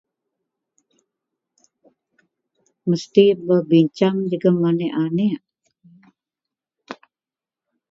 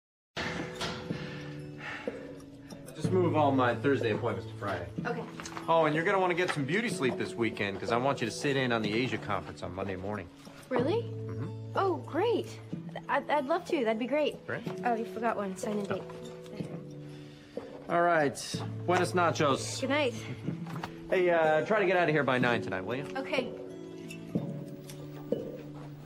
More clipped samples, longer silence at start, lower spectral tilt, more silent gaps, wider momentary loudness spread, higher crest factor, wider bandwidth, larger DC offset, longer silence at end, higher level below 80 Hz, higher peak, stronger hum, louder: neither; first, 2.85 s vs 0.35 s; first, -8 dB/octave vs -5.5 dB/octave; neither; first, 22 LU vs 17 LU; about the same, 22 dB vs 18 dB; second, 7.6 kHz vs 16 kHz; neither; first, 0.95 s vs 0 s; second, -70 dBFS vs -64 dBFS; first, 0 dBFS vs -14 dBFS; neither; first, -18 LUFS vs -31 LUFS